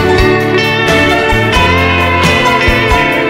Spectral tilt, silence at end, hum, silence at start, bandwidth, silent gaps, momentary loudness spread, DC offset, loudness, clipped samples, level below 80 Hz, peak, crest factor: -5 dB/octave; 0 s; none; 0 s; 16.5 kHz; none; 1 LU; under 0.1%; -9 LUFS; under 0.1%; -22 dBFS; 0 dBFS; 10 dB